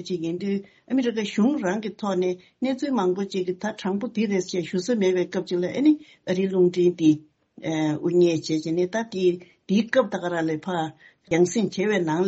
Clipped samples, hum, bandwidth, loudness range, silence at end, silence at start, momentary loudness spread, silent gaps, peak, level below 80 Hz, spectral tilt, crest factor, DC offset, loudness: under 0.1%; none; 8 kHz; 3 LU; 0 s; 0 s; 8 LU; none; -8 dBFS; -68 dBFS; -5.5 dB/octave; 16 dB; under 0.1%; -24 LUFS